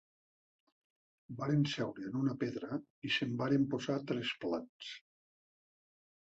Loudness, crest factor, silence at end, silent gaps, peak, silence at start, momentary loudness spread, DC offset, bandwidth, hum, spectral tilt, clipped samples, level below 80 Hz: -36 LUFS; 18 dB; 1.35 s; 2.90-3.02 s, 4.69-4.80 s; -22 dBFS; 1.3 s; 14 LU; under 0.1%; 8 kHz; none; -5 dB/octave; under 0.1%; -76 dBFS